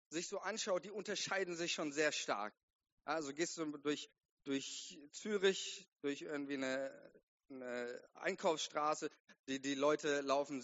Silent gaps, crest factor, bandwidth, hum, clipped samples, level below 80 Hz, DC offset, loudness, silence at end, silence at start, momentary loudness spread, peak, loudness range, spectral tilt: 2.63-2.68 s, 2.75-2.79 s, 2.92-2.97 s, 4.31-4.37 s, 5.88-5.96 s, 7.23-7.38 s, 9.20-9.28 s, 9.39-9.44 s; 20 dB; 8 kHz; none; under 0.1%; -90 dBFS; under 0.1%; -41 LUFS; 0 s; 0.1 s; 12 LU; -22 dBFS; 2 LU; -2 dB/octave